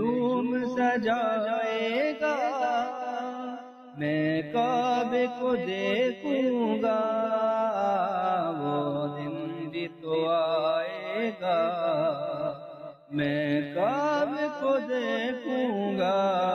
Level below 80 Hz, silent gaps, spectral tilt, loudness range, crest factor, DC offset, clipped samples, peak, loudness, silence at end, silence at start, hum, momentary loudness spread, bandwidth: -72 dBFS; none; -6.5 dB/octave; 2 LU; 12 dB; under 0.1%; under 0.1%; -16 dBFS; -28 LUFS; 0 s; 0 s; none; 8 LU; 6.8 kHz